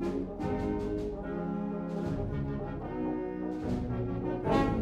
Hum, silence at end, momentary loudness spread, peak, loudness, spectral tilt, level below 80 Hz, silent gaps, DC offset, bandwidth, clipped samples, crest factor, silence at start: none; 0 s; 6 LU; -14 dBFS; -34 LUFS; -8.5 dB/octave; -44 dBFS; none; under 0.1%; 11.5 kHz; under 0.1%; 18 dB; 0 s